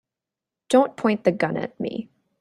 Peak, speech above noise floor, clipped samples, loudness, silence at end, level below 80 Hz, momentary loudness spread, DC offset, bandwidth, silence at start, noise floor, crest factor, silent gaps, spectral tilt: -4 dBFS; 66 dB; under 0.1%; -23 LUFS; 0.35 s; -66 dBFS; 11 LU; under 0.1%; 12 kHz; 0.7 s; -88 dBFS; 20 dB; none; -6 dB/octave